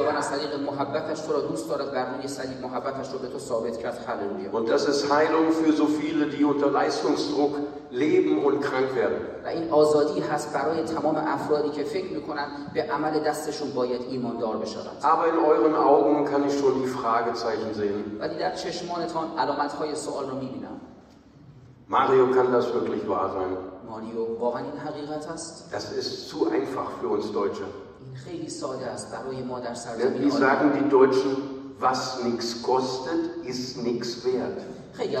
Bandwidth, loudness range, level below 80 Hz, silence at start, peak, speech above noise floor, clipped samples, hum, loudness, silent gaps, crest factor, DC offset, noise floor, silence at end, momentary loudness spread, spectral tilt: 13 kHz; 7 LU; -64 dBFS; 0 s; -6 dBFS; 25 dB; under 0.1%; none; -26 LUFS; none; 20 dB; under 0.1%; -51 dBFS; 0 s; 13 LU; -5 dB/octave